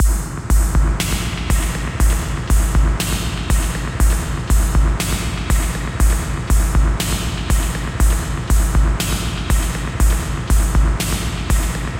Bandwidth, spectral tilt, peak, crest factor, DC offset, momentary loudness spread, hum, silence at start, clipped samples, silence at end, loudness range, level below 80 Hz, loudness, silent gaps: 16.5 kHz; -4.5 dB/octave; -4 dBFS; 12 dB; under 0.1%; 5 LU; none; 0 s; under 0.1%; 0 s; 1 LU; -18 dBFS; -19 LUFS; none